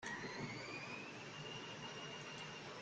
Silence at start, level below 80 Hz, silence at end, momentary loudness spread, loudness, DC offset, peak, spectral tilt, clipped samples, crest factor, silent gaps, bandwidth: 0 s; -76 dBFS; 0 s; 3 LU; -48 LUFS; under 0.1%; -34 dBFS; -3.5 dB/octave; under 0.1%; 14 dB; none; 9 kHz